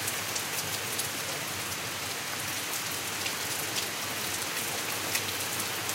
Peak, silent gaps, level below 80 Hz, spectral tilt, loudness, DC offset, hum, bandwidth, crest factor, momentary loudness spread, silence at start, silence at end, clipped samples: -10 dBFS; none; -68 dBFS; -1 dB/octave; -31 LUFS; under 0.1%; none; 16 kHz; 22 dB; 3 LU; 0 s; 0 s; under 0.1%